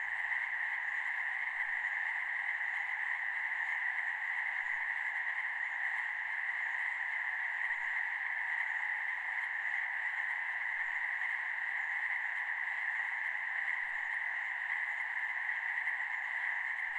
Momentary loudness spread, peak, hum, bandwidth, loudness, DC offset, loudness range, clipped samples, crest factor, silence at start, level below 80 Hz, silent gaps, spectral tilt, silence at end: 1 LU; -22 dBFS; none; 11.5 kHz; -35 LUFS; under 0.1%; 0 LU; under 0.1%; 14 dB; 0 s; -80 dBFS; none; 0.5 dB/octave; 0 s